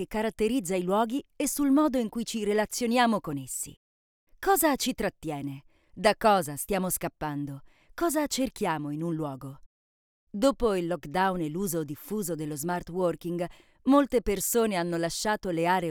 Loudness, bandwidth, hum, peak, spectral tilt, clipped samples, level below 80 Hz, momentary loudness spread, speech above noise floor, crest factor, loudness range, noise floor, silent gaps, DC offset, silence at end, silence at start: -28 LUFS; over 20 kHz; none; -8 dBFS; -4.5 dB/octave; under 0.1%; -52 dBFS; 11 LU; over 62 dB; 20 dB; 4 LU; under -90 dBFS; 3.77-4.27 s, 9.66-10.27 s; under 0.1%; 0 s; 0 s